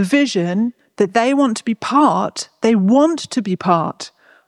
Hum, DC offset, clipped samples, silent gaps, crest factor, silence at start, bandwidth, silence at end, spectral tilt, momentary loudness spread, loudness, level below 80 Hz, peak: none; under 0.1%; under 0.1%; none; 16 dB; 0 s; 12 kHz; 0.4 s; -5.5 dB/octave; 10 LU; -17 LUFS; -66 dBFS; -2 dBFS